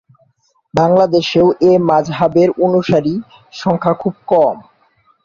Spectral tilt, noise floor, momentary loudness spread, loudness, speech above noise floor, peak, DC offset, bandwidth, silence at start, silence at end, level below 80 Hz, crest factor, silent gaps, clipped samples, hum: -7 dB/octave; -59 dBFS; 10 LU; -14 LUFS; 46 dB; -2 dBFS; under 0.1%; 7.2 kHz; 0.75 s; 0.65 s; -50 dBFS; 14 dB; none; under 0.1%; none